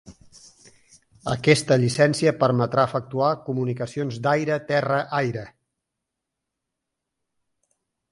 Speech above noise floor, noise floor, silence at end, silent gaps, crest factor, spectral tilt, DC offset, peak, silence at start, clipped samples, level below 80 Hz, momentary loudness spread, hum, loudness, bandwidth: 61 dB; -83 dBFS; 2.65 s; none; 22 dB; -5.5 dB/octave; under 0.1%; -2 dBFS; 0.05 s; under 0.1%; -60 dBFS; 10 LU; none; -22 LUFS; 11.5 kHz